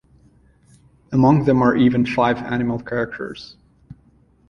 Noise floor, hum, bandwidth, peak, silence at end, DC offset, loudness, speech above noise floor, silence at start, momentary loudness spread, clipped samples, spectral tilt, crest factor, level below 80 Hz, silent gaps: -55 dBFS; none; 6.6 kHz; -2 dBFS; 0.55 s; under 0.1%; -18 LUFS; 37 dB; 1.1 s; 14 LU; under 0.1%; -8.5 dB/octave; 18 dB; -48 dBFS; none